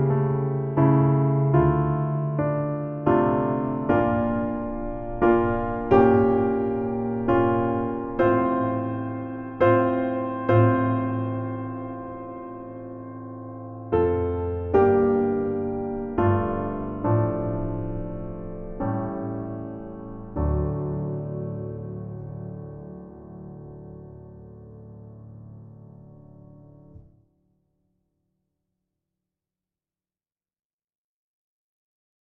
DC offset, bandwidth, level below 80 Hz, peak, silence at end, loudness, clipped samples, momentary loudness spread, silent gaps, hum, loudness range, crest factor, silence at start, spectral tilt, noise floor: under 0.1%; 4 kHz; -42 dBFS; -4 dBFS; 5.35 s; -24 LUFS; under 0.1%; 21 LU; none; none; 16 LU; 22 dB; 0 s; -9 dB/octave; under -90 dBFS